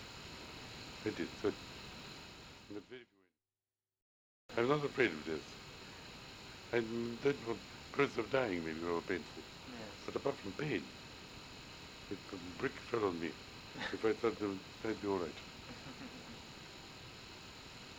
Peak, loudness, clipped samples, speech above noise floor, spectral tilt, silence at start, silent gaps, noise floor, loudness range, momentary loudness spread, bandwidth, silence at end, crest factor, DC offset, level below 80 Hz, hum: -18 dBFS; -41 LUFS; under 0.1%; over 51 dB; -5 dB/octave; 0 s; 4.02-4.49 s; under -90 dBFS; 7 LU; 16 LU; 17 kHz; 0 s; 24 dB; under 0.1%; -66 dBFS; none